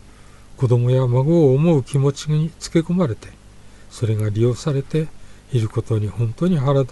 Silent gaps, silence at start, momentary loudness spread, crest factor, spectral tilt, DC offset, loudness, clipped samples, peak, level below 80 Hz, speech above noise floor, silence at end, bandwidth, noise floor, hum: none; 0.5 s; 9 LU; 14 dB; -8 dB/octave; under 0.1%; -19 LUFS; under 0.1%; -4 dBFS; -46 dBFS; 25 dB; 0 s; 11.5 kHz; -43 dBFS; 50 Hz at -40 dBFS